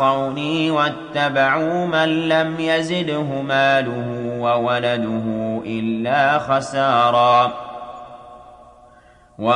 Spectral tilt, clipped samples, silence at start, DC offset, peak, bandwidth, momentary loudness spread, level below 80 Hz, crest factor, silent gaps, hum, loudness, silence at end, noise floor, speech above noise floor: -5.5 dB/octave; under 0.1%; 0 s; under 0.1%; -4 dBFS; 10 kHz; 10 LU; -58 dBFS; 16 dB; none; none; -19 LUFS; 0 s; -49 dBFS; 31 dB